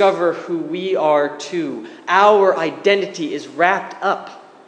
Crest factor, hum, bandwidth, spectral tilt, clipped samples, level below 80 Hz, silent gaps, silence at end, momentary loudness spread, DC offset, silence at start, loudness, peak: 18 dB; none; 9.4 kHz; -4.5 dB/octave; under 0.1%; -76 dBFS; none; 0.3 s; 13 LU; under 0.1%; 0 s; -18 LUFS; 0 dBFS